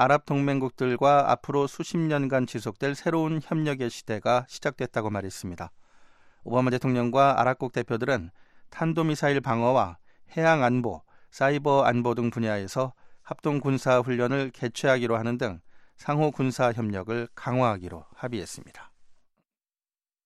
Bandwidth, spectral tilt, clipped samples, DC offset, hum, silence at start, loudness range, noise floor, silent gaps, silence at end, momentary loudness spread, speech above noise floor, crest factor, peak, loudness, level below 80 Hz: 13.5 kHz; -6.5 dB/octave; under 0.1%; under 0.1%; none; 0 s; 4 LU; under -90 dBFS; none; 1.15 s; 13 LU; over 64 dB; 20 dB; -8 dBFS; -26 LUFS; -60 dBFS